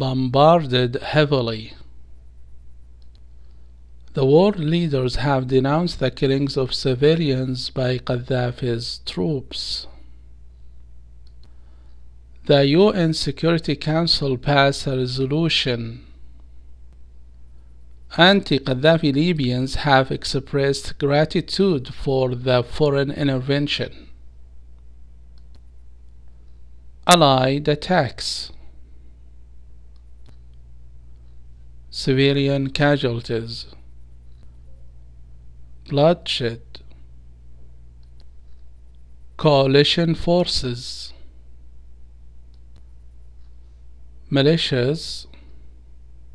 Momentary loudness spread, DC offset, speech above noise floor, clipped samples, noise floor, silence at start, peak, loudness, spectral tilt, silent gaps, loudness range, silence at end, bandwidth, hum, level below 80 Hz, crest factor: 12 LU; 0.7%; 26 dB; under 0.1%; -45 dBFS; 0 s; 0 dBFS; -19 LUFS; -5.5 dB/octave; none; 9 LU; 0.65 s; 11 kHz; 60 Hz at -45 dBFS; -42 dBFS; 22 dB